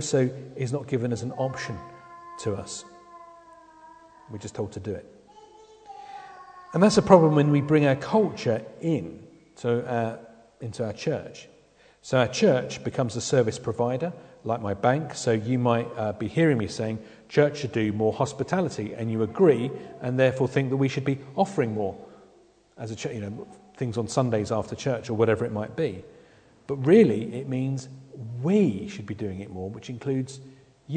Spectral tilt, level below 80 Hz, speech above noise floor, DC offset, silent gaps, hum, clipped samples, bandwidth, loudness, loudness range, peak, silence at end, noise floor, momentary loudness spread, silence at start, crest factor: -6.5 dB/octave; -60 dBFS; 33 dB; under 0.1%; none; none; under 0.1%; 9.4 kHz; -26 LUFS; 12 LU; -2 dBFS; 0 s; -58 dBFS; 19 LU; 0 s; 24 dB